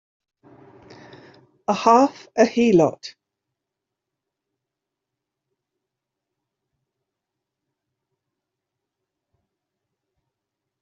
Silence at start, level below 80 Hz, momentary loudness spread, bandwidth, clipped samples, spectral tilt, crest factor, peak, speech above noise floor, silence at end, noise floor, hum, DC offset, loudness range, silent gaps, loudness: 1.7 s; -68 dBFS; 18 LU; 7.6 kHz; under 0.1%; -5.5 dB/octave; 24 dB; -2 dBFS; 67 dB; 7.7 s; -84 dBFS; none; under 0.1%; 4 LU; none; -18 LUFS